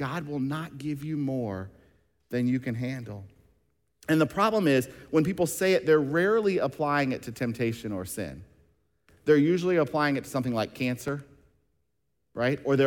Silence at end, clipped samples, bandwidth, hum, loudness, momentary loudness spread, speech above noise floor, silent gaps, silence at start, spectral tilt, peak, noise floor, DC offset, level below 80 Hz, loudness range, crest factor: 0 s; under 0.1%; 18 kHz; none; -27 LUFS; 13 LU; 52 dB; none; 0 s; -6 dB/octave; -10 dBFS; -79 dBFS; under 0.1%; -62 dBFS; 7 LU; 18 dB